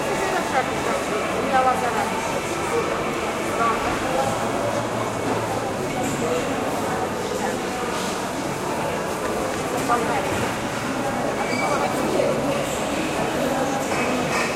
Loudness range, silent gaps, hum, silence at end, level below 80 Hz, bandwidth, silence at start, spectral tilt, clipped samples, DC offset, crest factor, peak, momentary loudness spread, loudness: 2 LU; none; none; 0 s; -48 dBFS; 16 kHz; 0 s; -4 dB/octave; under 0.1%; under 0.1%; 18 dB; -6 dBFS; 4 LU; -23 LUFS